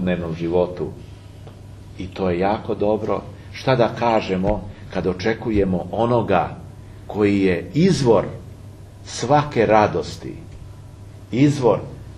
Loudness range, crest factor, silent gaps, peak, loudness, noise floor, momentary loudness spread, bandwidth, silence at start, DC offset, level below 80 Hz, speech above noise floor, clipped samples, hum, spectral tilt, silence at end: 4 LU; 20 dB; none; 0 dBFS; -20 LUFS; -39 dBFS; 23 LU; 12 kHz; 0 s; under 0.1%; -42 dBFS; 20 dB; under 0.1%; none; -6.5 dB/octave; 0 s